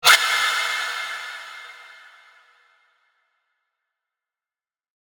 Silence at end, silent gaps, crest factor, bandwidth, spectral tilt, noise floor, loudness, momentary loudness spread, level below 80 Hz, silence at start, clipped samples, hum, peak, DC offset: 3.2 s; none; 26 dB; 19.5 kHz; 3 dB/octave; under -90 dBFS; -20 LUFS; 24 LU; -76 dBFS; 0.05 s; under 0.1%; none; 0 dBFS; under 0.1%